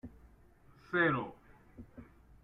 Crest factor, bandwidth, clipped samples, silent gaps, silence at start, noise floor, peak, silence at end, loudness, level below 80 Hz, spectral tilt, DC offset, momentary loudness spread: 22 dB; 6 kHz; under 0.1%; none; 0.05 s; -62 dBFS; -18 dBFS; 0.4 s; -33 LUFS; -64 dBFS; -8 dB/octave; under 0.1%; 26 LU